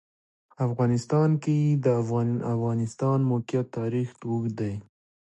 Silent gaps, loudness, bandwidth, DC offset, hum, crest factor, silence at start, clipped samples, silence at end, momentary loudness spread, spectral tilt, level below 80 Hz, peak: none; -26 LUFS; 8.8 kHz; under 0.1%; none; 16 dB; 0.6 s; under 0.1%; 0.55 s; 7 LU; -8.5 dB/octave; -62 dBFS; -10 dBFS